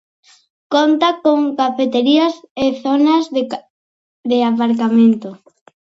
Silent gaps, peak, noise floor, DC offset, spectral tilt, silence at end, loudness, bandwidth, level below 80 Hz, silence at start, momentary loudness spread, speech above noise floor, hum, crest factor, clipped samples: 2.51-2.55 s, 3.70-4.24 s; 0 dBFS; under -90 dBFS; under 0.1%; -5.5 dB/octave; 0.6 s; -15 LUFS; 7.6 kHz; -60 dBFS; 0.7 s; 9 LU; over 76 dB; none; 16 dB; under 0.1%